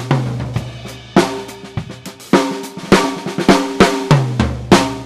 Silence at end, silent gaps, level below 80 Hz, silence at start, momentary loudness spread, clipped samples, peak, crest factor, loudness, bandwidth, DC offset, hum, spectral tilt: 0 s; none; -36 dBFS; 0 s; 15 LU; under 0.1%; 0 dBFS; 16 dB; -15 LUFS; 15 kHz; under 0.1%; none; -5.5 dB/octave